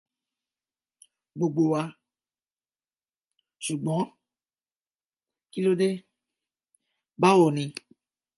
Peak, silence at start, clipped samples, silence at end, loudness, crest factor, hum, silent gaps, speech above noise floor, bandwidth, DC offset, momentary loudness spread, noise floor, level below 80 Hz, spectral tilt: -8 dBFS; 1.35 s; under 0.1%; 0.65 s; -25 LUFS; 22 dB; none; 5.05-5.10 s; over 66 dB; 11.5 kHz; under 0.1%; 17 LU; under -90 dBFS; -78 dBFS; -6 dB/octave